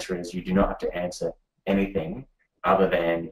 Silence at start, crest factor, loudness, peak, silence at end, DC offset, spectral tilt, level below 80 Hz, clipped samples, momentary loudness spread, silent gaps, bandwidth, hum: 0 s; 18 dB; -26 LUFS; -8 dBFS; 0 s; under 0.1%; -6.5 dB/octave; -44 dBFS; under 0.1%; 12 LU; none; 14.5 kHz; none